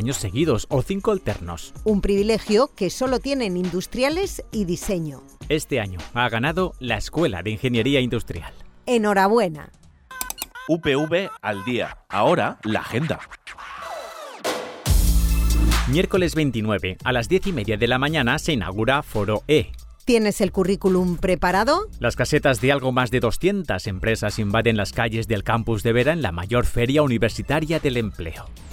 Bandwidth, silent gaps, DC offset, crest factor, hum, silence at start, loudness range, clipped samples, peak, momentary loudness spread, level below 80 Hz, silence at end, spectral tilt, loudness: 17.5 kHz; none; under 0.1%; 16 dB; none; 0 s; 4 LU; under 0.1%; -6 dBFS; 10 LU; -32 dBFS; 0 s; -5.5 dB/octave; -22 LUFS